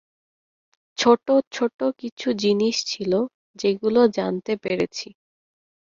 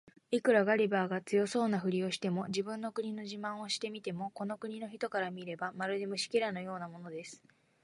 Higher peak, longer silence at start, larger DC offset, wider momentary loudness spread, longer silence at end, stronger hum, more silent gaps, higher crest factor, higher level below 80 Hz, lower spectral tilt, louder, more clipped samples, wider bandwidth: first, -4 dBFS vs -16 dBFS; first, 1 s vs 0.3 s; neither; second, 10 LU vs 13 LU; first, 0.8 s vs 0.5 s; neither; first, 1.47-1.51 s, 1.74-1.79 s, 2.12-2.17 s, 3.34-3.54 s vs none; about the same, 20 dB vs 20 dB; first, -64 dBFS vs -80 dBFS; about the same, -4.5 dB/octave vs -5 dB/octave; first, -22 LUFS vs -35 LUFS; neither; second, 7.6 kHz vs 11.5 kHz